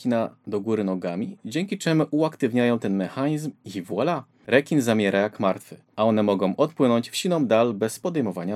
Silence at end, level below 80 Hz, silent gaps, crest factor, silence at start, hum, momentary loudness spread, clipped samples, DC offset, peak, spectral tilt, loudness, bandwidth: 0 s; -84 dBFS; none; 20 dB; 0 s; none; 9 LU; under 0.1%; under 0.1%; -4 dBFS; -6 dB/octave; -24 LUFS; 15 kHz